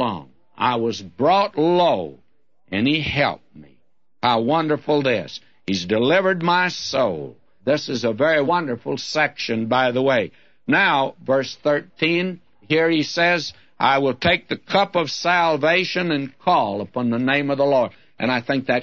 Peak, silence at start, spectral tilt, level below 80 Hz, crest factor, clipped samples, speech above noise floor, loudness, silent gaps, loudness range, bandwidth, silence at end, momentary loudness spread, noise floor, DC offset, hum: -2 dBFS; 0 s; -5 dB/octave; -56 dBFS; 18 dB; under 0.1%; 46 dB; -20 LUFS; none; 2 LU; 7.8 kHz; 0 s; 9 LU; -66 dBFS; 0.2%; none